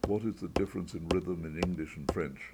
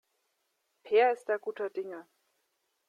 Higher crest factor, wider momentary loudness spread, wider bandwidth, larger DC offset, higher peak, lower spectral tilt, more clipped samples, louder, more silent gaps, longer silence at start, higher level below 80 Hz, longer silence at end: about the same, 20 dB vs 18 dB; second, 4 LU vs 16 LU; first, 18 kHz vs 10.5 kHz; neither; about the same, -14 dBFS vs -14 dBFS; first, -6.5 dB/octave vs -4 dB/octave; neither; second, -35 LUFS vs -30 LUFS; neither; second, 0.05 s vs 0.85 s; first, -48 dBFS vs under -90 dBFS; second, 0 s vs 0.85 s